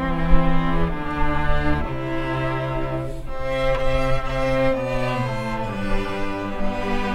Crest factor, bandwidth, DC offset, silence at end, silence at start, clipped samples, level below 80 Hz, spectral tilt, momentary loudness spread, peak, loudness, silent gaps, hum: 20 dB; 9 kHz; under 0.1%; 0 s; 0 s; under 0.1%; -26 dBFS; -7 dB/octave; 6 LU; 0 dBFS; -24 LUFS; none; none